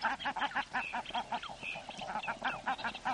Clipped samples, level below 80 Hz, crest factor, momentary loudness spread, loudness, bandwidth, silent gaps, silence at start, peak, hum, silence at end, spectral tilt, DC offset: under 0.1%; -64 dBFS; 18 dB; 6 LU; -38 LUFS; 11.5 kHz; none; 0 s; -20 dBFS; none; 0 s; -2.5 dB/octave; under 0.1%